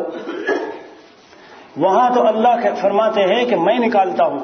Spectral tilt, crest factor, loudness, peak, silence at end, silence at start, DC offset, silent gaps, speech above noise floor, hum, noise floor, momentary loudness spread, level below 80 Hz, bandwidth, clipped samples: -5.5 dB/octave; 14 dB; -16 LUFS; -2 dBFS; 0 s; 0 s; under 0.1%; none; 29 dB; none; -44 dBFS; 11 LU; -68 dBFS; 6.6 kHz; under 0.1%